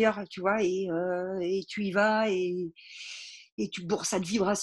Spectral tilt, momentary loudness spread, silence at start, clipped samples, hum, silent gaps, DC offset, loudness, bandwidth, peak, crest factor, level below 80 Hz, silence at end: -4.5 dB/octave; 15 LU; 0 s; under 0.1%; none; 3.52-3.58 s; under 0.1%; -29 LUFS; 12.5 kHz; -10 dBFS; 18 dB; -66 dBFS; 0 s